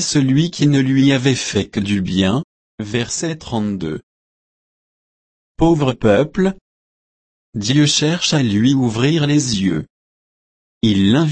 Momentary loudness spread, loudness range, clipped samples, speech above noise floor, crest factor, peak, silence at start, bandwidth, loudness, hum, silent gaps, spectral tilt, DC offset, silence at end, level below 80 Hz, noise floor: 10 LU; 6 LU; under 0.1%; over 74 dB; 16 dB; -2 dBFS; 0 s; 8.8 kHz; -16 LUFS; none; 2.44-2.78 s, 4.03-5.55 s, 6.61-7.53 s, 9.90-10.81 s; -5 dB/octave; under 0.1%; 0 s; -42 dBFS; under -90 dBFS